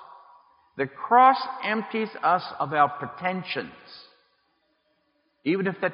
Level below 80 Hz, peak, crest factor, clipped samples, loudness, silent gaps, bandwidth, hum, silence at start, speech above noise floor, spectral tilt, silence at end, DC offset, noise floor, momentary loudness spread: -76 dBFS; -6 dBFS; 20 dB; under 0.1%; -24 LUFS; none; 5.4 kHz; none; 0 s; 46 dB; -3 dB/octave; 0 s; under 0.1%; -70 dBFS; 15 LU